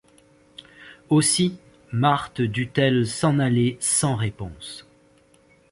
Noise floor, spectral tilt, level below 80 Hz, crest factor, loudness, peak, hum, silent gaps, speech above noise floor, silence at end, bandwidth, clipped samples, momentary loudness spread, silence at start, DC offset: -57 dBFS; -4.5 dB/octave; -52 dBFS; 18 dB; -22 LUFS; -4 dBFS; none; none; 36 dB; 0.9 s; 12 kHz; under 0.1%; 16 LU; 0.8 s; under 0.1%